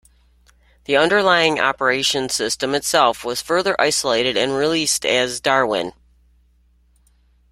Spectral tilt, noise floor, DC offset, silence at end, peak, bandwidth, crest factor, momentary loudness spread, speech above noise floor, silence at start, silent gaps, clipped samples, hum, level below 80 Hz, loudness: -2 dB/octave; -57 dBFS; under 0.1%; 1.6 s; -2 dBFS; 16 kHz; 18 dB; 6 LU; 39 dB; 0.9 s; none; under 0.1%; none; -54 dBFS; -18 LUFS